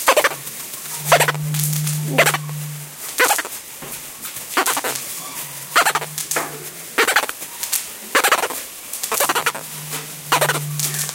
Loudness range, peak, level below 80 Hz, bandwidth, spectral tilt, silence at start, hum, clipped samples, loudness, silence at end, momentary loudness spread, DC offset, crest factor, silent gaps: 3 LU; 0 dBFS; -60 dBFS; 17.5 kHz; -2 dB/octave; 0 s; none; under 0.1%; -20 LUFS; 0 s; 13 LU; under 0.1%; 22 dB; none